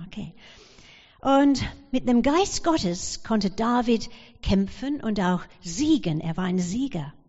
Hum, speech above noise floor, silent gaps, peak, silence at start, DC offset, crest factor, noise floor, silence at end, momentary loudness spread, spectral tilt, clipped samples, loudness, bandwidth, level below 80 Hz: none; 27 dB; none; -10 dBFS; 0 s; under 0.1%; 16 dB; -51 dBFS; 0.15 s; 10 LU; -5.5 dB/octave; under 0.1%; -24 LUFS; 8 kHz; -44 dBFS